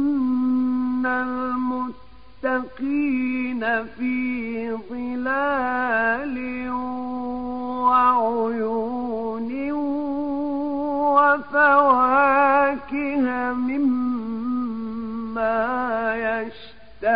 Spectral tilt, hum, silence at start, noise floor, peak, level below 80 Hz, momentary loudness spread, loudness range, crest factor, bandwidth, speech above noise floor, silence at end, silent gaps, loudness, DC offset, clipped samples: -10 dB/octave; none; 0 s; -48 dBFS; -6 dBFS; -54 dBFS; 12 LU; 6 LU; 18 dB; 5.2 kHz; 26 dB; 0 s; none; -22 LUFS; 0.7%; under 0.1%